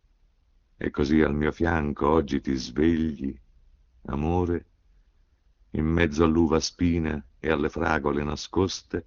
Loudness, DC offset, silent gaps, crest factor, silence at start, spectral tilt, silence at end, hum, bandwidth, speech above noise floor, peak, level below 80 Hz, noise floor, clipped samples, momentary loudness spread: -26 LUFS; under 0.1%; none; 20 dB; 0.8 s; -5.5 dB/octave; 0.05 s; none; 7.4 kHz; 38 dB; -6 dBFS; -40 dBFS; -63 dBFS; under 0.1%; 10 LU